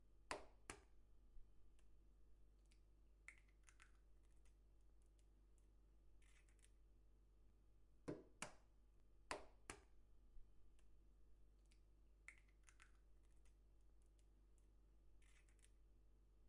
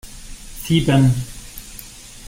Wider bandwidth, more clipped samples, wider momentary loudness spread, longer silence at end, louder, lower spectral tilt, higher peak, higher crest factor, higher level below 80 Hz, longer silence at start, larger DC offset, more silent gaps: second, 11 kHz vs 16.5 kHz; neither; second, 11 LU vs 22 LU; about the same, 0 s vs 0 s; second, -59 LUFS vs -17 LUFS; second, -3.5 dB/octave vs -6 dB/octave; second, -28 dBFS vs -2 dBFS; first, 36 dB vs 18 dB; second, -72 dBFS vs -36 dBFS; about the same, 0 s vs 0.05 s; neither; neither